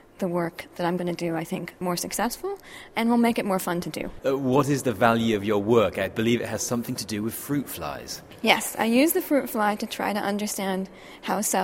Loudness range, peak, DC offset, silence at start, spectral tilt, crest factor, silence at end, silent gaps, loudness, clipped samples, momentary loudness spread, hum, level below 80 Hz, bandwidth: 3 LU; -2 dBFS; under 0.1%; 0.2 s; -4.5 dB/octave; 24 dB; 0 s; none; -25 LUFS; under 0.1%; 11 LU; none; -56 dBFS; 16.5 kHz